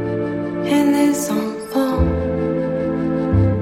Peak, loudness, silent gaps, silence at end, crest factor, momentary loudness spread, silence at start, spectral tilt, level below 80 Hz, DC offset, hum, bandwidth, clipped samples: -4 dBFS; -19 LUFS; none; 0 s; 14 dB; 7 LU; 0 s; -6.5 dB/octave; -32 dBFS; under 0.1%; none; 16.5 kHz; under 0.1%